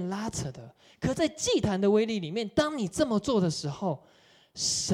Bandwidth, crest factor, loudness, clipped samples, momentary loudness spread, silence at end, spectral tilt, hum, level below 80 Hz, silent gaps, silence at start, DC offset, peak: 15 kHz; 16 dB; -28 LUFS; under 0.1%; 11 LU; 0 s; -4.5 dB/octave; none; -54 dBFS; none; 0 s; under 0.1%; -12 dBFS